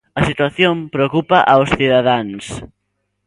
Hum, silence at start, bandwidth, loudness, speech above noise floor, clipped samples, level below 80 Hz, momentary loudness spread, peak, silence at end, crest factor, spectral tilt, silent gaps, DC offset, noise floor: none; 0.15 s; 11.5 kHz; -14 LUFS; 56 dB; under 0.1%; -42 dBFS; 15 LU; 0 dBFS; 0.6 s; 16 dB; -6 dB/octave; none; under 0.1%; -71 dBFS